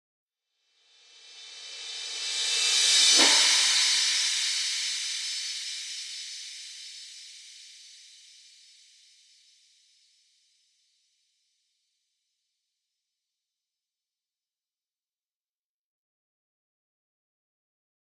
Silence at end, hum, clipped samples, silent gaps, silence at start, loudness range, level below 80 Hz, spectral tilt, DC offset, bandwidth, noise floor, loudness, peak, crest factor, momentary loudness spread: 10.05 s; none; under 0.1%; none; 1.25 s; 20 LU; under -90 dBFS; 4 dB/octave; under 0.1%; 16 kHz; under -90 dBFS; -22 LUFS; -8 dBFS; 24 dB; 25 LU